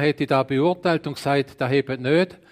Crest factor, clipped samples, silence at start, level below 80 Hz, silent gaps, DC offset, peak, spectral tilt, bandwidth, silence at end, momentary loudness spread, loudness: 16 dB; under 0.1%; 0 s; -60 dBFS; none; under 0.1%; -6 dBFS; -7 dB/octave; 15.5 kHz; 0.15 s; 3 LU; -22 LUFS